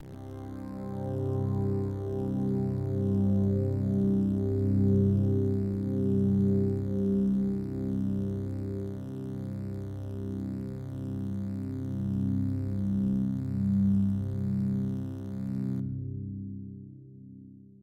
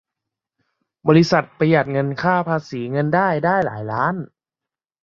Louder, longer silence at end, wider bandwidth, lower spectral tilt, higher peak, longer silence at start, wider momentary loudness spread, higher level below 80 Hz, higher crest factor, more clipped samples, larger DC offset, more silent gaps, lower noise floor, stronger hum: second, -30 LUFS vs -19 LUFS; second, 0.25 s vs 0.8 s; second, 4.3 kHz vs 7.2 kHz; first, -11 dB/octave vs -7 dB/octave; second, -14 dBFS vs -2 dBFS; second, 0 s vs 1.05 s; first, 12 LU vs 9 LU; first, -52 dBFS vs -58 dBFS; about the same, 14 dB vs 18 dB; neither; neither; neither; second, -50 dBFS vs -88 dBFS; neither